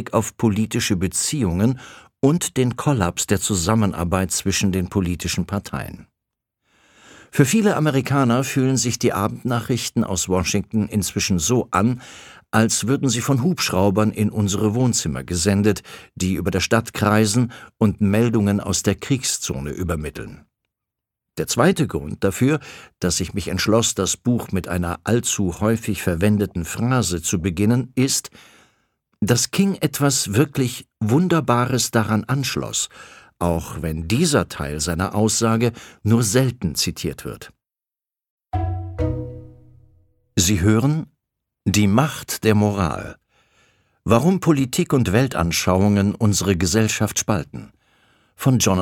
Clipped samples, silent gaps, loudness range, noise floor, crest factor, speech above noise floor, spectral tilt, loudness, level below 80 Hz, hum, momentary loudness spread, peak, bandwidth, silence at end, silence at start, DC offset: under 0.1%; 38.30-38.38 s; 4 LU; -90 dBFS; 20 dB; 70 dB; -5 dB/octave; -20 LUFS; -42 dBFS; none; 9 LU; -2 dBFS; 18 kHz; 0 s; 0 s; under 0.1%